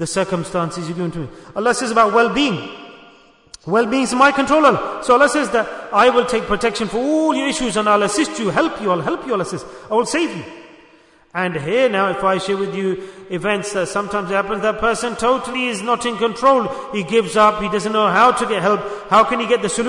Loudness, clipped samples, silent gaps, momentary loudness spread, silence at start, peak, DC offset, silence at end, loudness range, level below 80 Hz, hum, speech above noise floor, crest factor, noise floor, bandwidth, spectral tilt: -17 LUFS; under 0.1%; none; 10 LU; 0 s; -2 dBFS; under 0.1%; 0 s; 5 LU; -48 dBFS; none; 32 dB; 16 dB; -50 dBFS; 11 kHz; -4 dB/octave